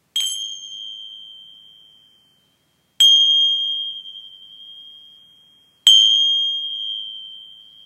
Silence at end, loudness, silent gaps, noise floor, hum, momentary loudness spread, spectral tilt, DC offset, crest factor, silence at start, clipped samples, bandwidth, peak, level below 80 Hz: 0.4 s; -14 LUFS; none; -64 dBFS; none; 26 LU; 5 dB/octave; under 0.1%; 22 dB; 0.15 s; under 0.1%; 15.5 kHz; 0 dBFS; -80 dBFS